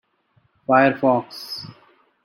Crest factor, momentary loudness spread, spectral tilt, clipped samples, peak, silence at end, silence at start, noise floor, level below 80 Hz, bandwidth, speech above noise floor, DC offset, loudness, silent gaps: 20 dB; 18 LU; -6.5 dB/octave; under 0.1%; -4 dBFS; 0.55 s; 0.7 s; -63 dBFS; -66 dBFS; 14.5 kHz; 44 dB; under 0.1%; -19 LUFS; none